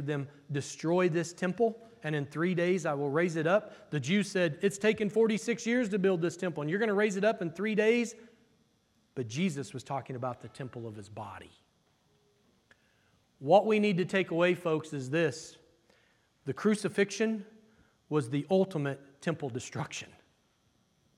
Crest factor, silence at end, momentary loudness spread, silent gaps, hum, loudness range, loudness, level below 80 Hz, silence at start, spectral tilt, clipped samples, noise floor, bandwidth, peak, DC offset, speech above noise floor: 20 dB; 1.15 s; 14 LU; none; none; 9 LU; -31 LUFS; -78 dBFS; 0 s; -5.5 dB/octave; under 0.1%; -71 dBFS; 13 kHz; -10 dBFS; under 0.1%; 41 dB